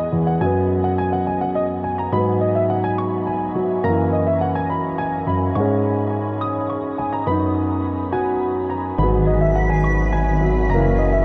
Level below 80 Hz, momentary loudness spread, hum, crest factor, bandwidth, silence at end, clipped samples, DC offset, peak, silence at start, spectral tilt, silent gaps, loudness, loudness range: -26 dBFS; 6 LU; none; 14 dB; 6.2 kHz; 0 s; under 0.1%; under 0.1%; -4 dBFS; 0 s; -10 dB/octave; none; -20 LUFS; 2 LU